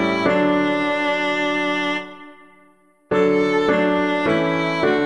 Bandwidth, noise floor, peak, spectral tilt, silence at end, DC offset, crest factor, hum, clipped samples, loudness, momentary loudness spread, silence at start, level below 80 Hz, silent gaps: 10.5 kHz; -55 dBFS; -4 dBFS; -6 dB/octave; 0 s; 0.3%; 14 dB; none; under 0.1%; -19 LUFS; 4 LU; 0 s; -56 dBFS; none